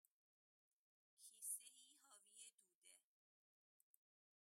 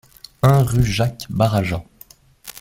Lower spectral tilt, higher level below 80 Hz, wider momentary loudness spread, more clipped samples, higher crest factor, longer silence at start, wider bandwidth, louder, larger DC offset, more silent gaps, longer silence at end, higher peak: second, 4 dB/octave vs -6.5 dB/octave; second, under -90 dBFS vs -38 dBFS; about the same, 17 LU vs 15 LU; neither; first, 26 dB vs 18 dB; first, 1.2 s vs 0.45 s; about the same, 16 kHz vs 16.5 kHz; second, -55 LUFS vs -19 LUFS; neither; first, 2.54-2.58 s, 2.75-2.82 s vs none; first, 1.4 s vs 0.1 s; second, -38 dBFS vs -2 dBFS